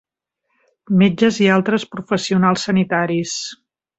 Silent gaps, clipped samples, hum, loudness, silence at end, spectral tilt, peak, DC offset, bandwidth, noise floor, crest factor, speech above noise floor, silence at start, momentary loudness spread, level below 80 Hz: none; under 0.1%; none; -17 LUFS; 0.45 s; -5.5 dB/octave; 0 dBFS; under 0.1%; 8 kHz; -74 dBFS; 18 dB; 57 dB; 0.9 s; 9 LU; -58 dBFS